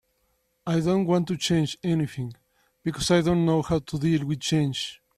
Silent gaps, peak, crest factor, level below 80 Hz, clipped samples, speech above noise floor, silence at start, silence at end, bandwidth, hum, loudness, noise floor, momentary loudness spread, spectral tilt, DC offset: none; -10 dBFS; 16 dB; -52 dBFS; under 0.1%; 47 dB; 0.65 s; 0.2 s; 13.5 kHz; none; -25 LUFS; -71 dBFS; 10 LU; -6 dB/octave; under 0.1%